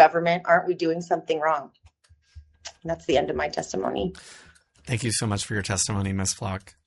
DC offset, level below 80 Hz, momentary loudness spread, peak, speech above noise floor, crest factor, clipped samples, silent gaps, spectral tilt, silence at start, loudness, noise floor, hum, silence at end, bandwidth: under 0.1%; -54 dBFS; 18 LU; -2 dBFS; 33 dB; 22 dB; under 0.1%; none; -4 dB/octave; 0 s; -25 LUFS; -59 dBFS; none; 0.15 s; 11.5 kHz